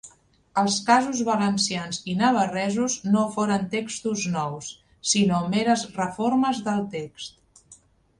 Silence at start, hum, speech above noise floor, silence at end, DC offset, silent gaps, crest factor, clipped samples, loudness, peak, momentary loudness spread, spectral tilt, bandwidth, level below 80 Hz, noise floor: 0.05 s; none; 31 dB; 0.45 s; under 0.1%; none; 20 dB; under 0.1%; -24 LUFS; -4 dBFS; 11 LU; -4 dB/octave; 11 kHz; -62 dBFS; -55 dBFS